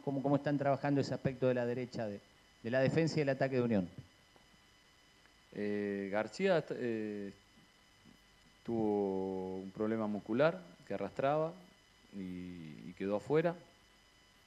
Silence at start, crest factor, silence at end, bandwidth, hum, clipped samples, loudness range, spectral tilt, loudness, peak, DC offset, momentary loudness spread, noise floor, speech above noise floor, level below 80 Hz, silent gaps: 0.05 s; 22 dB; 0.8 s; 12.5 kHz; none; under 0.1%; 4 LU; -7.5 dB/octave; -36 LUFS; -16 dBFS; under 0.1%; 15 LU; -65 dBFS; 30 dB; -72 dBFS; none